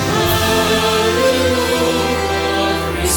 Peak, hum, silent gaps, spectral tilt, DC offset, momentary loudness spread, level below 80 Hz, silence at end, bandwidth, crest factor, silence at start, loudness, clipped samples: -2 dBFS; none; none; -3.5 dB/octave; under 0.1%; 3 LU; -32 dBFS; 0 s; 18 kHz; 12 dB; 0 s; -15 LUFS; under 0.1%